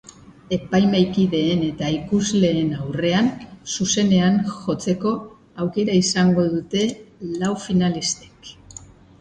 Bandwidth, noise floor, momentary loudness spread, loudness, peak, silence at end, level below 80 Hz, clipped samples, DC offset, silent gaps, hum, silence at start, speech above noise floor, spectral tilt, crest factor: 9.4 kHz; -43 dBFS; 13 LU; -21 LUFS; -4 dBFS; 0.4 s; -50 dBFS; under 0.1%; under 0.1%; none; none; 0.5 s; 23 dB; -5 dB/octave; 16 dB